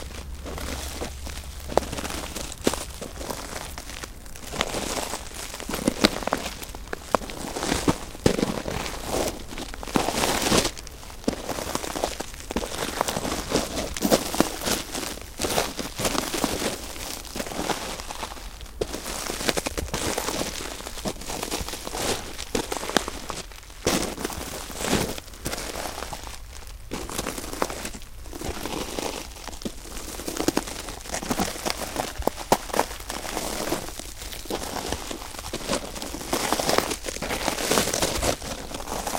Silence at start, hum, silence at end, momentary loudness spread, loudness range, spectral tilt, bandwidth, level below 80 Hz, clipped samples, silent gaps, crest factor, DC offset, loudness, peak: 0 s; none; 0 s; 12 LU; 5 LU; -3 dB/octave; 17 kHz; -40 dBFS; under 0.1%; none; 28 dB; under 0.1%; -28 LUFS; 0 dBFS